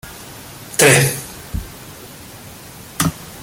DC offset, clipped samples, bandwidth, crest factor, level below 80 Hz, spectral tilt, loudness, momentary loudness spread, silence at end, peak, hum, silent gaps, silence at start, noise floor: under 0.1%; under 0.1%; 17 kHz; 20 dB; -40 dBFS; -3.5 dB/octave; -15 LUFS; 25 LU; 0 s; 0 dBFS; none; none; 0.05 s; -37 dBFS